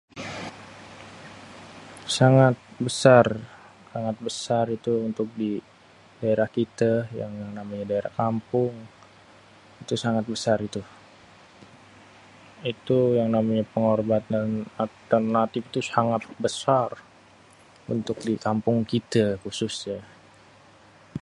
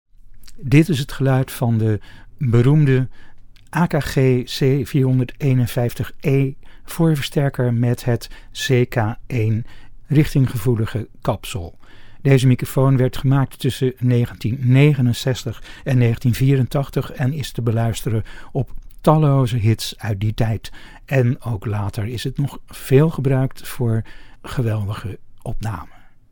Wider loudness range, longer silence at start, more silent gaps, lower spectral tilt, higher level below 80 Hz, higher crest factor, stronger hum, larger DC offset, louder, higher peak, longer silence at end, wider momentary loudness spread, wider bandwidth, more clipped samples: first, 7 LU vs 3 LU; about the same, 0.15 s vs 0.25 s; neither; about the same, -6 dB/octave vs -7 dB/octave; second, -60 dBFS vs -38 dBFS; first, 24 dB vs 18 dB; neither; neither; second, -25 LUFS vs -19 LUFS; about the same, -2 dBFS vs 0 dBFS; second, 0.05 s vs 0.3 s; first, 19 LU vs 13 LU; second, 11.5 kHz vs 18.5 kHz; neither